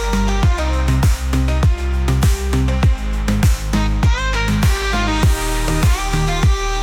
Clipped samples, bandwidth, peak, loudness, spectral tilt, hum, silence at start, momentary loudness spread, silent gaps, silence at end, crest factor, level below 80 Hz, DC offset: under 0.1%; 16.5 kHz; -6 dBFS; -17 LUFS; -5.5 dB/octave; none; 0 s; 3 LU; none; 0 s; 10 dB; -18 dBFS; under 0.1%